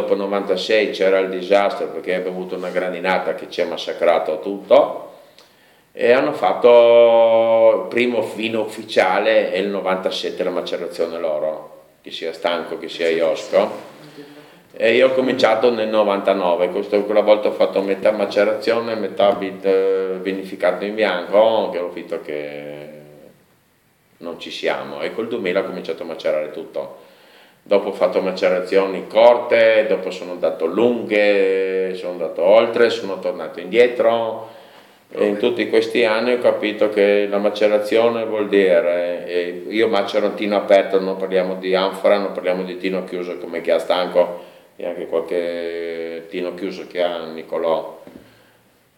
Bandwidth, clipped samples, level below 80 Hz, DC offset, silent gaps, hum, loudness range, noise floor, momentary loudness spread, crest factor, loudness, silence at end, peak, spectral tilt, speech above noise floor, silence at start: 16 kHz; under 0.1%; -72 dBFS; under 0.1%; none; none; 9 LU; -59 dBFS; 13 LU; 18 dB; -18 LUFS; 0.8 s; 0 dBFS; -5 dB/octave; 41 dB; 0 s